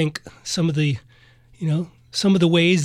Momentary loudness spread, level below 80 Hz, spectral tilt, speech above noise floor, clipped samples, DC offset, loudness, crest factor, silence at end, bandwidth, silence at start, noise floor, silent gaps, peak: 13 LU; -56 dBFS; -5.5 dB/octave; 32 dB; under 0.1%; under 0.1%; -21 LUFS; 16 dB; 0 s; 12.5 kHz; 0 s; -52 dBFS; none; -6 dBFS